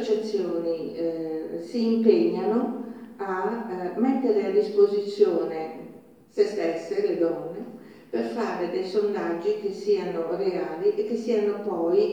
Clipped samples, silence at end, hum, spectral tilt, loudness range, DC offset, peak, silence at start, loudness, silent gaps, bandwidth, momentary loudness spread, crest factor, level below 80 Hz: under 0.1%; 0 s; none; -6.5 dB/octave; 3 LU; under 0.1%; -6 dBFS; 0 s; -26 LUFS; none; 8.8 kHz; 12 LU; 20 dB; -74 dBFS